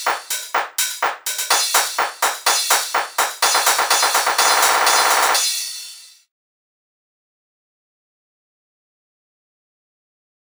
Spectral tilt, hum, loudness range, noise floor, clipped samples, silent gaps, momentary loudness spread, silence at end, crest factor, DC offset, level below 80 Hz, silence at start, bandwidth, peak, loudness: 3 dB/octave; none; 7 LU; -39 dBFS; under 0.1%; none; 9 LU; 4.45 s; 20 dB; under 0.1%; -70 dBFS; 0 s; over 20 kHz; -2 dBFS; -16 LUFS